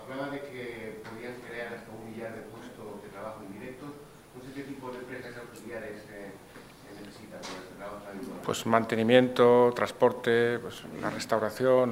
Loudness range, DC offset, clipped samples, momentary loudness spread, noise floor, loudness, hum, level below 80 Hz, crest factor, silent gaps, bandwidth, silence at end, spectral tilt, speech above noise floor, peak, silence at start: 17 LU; under 0.1%; under 0.1%; 22 LU; -49 dBFS; -28 LUFS; none; -64 dBFS; 24 dB; none; 16 kHz; 0 s; -5.5 dB/octave; 22 dB; -6 dBFS; 0 s